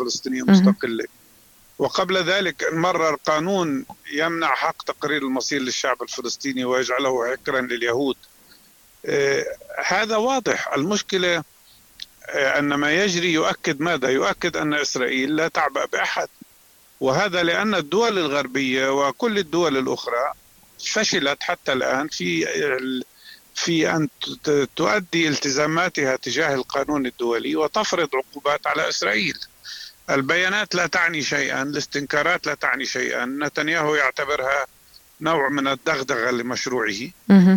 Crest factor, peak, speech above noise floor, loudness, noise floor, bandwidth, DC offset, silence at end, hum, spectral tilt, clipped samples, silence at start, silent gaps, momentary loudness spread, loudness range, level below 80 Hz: 18 dB; -4 dBFS; 32 dB; -21 LUFS; -53 dBFS; 19 kHz; under 0.1%; 0 s; none; -4 dB/octave; under 0.1%; 0 s; none; 7 LU; 2 LU; -60 dBFS